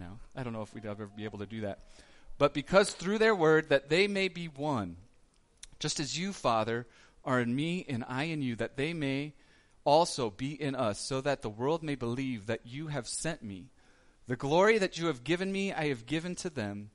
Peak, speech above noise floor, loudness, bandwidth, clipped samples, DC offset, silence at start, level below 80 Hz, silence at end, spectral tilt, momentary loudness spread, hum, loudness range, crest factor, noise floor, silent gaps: -10 dBFS; 33 dB; -32 LUFS; 11.5 kHz; under 0.1%; under 0.1%; 0 s; -58 dBFS; 0.05 s; -5 dB/octave; 15 LU; none; 6 LU; 22 dB; -64 dBFS; none